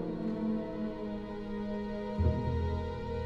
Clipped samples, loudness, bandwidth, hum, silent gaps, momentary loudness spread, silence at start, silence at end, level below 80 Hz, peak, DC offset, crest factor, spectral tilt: under 0.1%; -35 LUFS; 6.4 kHz; none; none; 8 LU; 0 s; 0 s; -42 dBFS; -16 dBFS; under 0.1%; 18 dB; -9.5 dB/octave